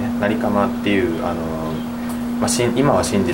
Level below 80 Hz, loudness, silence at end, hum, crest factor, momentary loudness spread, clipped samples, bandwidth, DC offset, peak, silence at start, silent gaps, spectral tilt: -42 dBFS; -19 LUFS; 0 s; none; 16 dB; 8 LU; under 0.1%; 16.5 kHz; under 0.1%; -2 dBFS; 0 s; none; -5 dB/octave